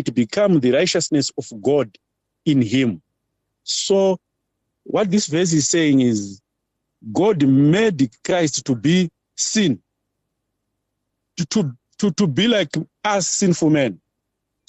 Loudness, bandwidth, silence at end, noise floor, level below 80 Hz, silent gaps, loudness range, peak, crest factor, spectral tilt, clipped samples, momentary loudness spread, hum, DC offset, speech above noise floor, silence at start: -19 LUFS; 8.6 kHz; 0.7 s; -77 dBFS; -58 dBFS; none; 5 LU; -6 dBFS; 14 dB; -4.5 dB/octave; under 0.1%; 10 LU; none; under 0.1%; 59 dB; 0 s